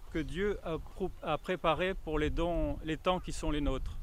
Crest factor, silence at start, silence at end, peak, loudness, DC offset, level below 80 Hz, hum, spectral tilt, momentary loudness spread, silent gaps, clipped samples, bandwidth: 20 dB; 0 s; 0 s; -14 dBFS; -35 LUFS; under 0.1%; -40 dBFS; none; -6 dB/octave; 7 LU; none; under 0.1%; 15 kHz